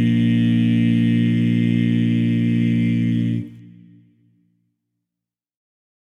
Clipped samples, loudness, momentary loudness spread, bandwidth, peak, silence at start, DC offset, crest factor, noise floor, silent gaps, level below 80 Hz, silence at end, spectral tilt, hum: under 0.1%; -18 LUFS; 4 LU; 6.2 kHz; -8 dBFS; 0 s; under 0.1%; 12 dB; -86 dBFS; none; -66 dBFS; 2.55 s; -8.5 dB/octave; none